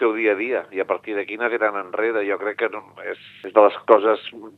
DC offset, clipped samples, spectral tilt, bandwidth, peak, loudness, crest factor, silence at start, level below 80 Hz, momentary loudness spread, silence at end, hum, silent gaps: under 0.1%; under 0.1%; -6 dB/octave; 4.4 kHz; 0 dBFS; -21 LUFS; 22 dB; 0 s; -78 dBFS; 16 LU; 0.1 s; none; none